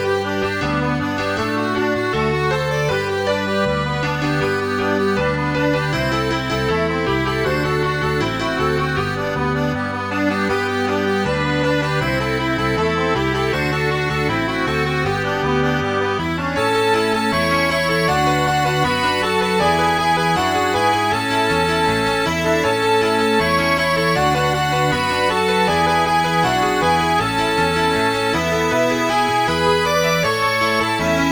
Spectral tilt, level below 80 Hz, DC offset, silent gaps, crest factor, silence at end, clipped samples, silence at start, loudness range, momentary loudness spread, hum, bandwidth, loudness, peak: -5 dB/octave; -38 dBFS; under 0.1%; none; 14 dB; 0 s; under 0.1%; 0 s; 3 LU; 3 LU; none; over 20 kHz; -18 LUFS; -4 dBFS